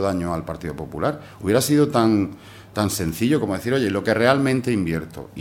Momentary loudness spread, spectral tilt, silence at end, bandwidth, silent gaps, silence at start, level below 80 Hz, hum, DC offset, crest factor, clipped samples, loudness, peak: 13 LU; -5.5 dB/octave; 0 s; 17 kHz; none; 0 s; -48 dBFS; none; under 0.1%; 20 dB; under 0.1%; -21 LUFS; 0 dBFS